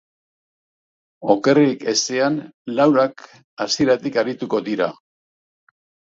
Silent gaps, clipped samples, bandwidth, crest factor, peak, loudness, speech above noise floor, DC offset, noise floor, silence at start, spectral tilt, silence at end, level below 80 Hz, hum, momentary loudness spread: 2.54-2.65 s, 3.44-3.57 s; under 0.1%; 7.8 kHz; 20 dB; 0 dBFS; -19 LUFS; over 71 dB; under 0.1%; under -90 dBFS; 1.2 s; -4 dB/octave; 1.2 s; -64 dBFS; none; 10 LU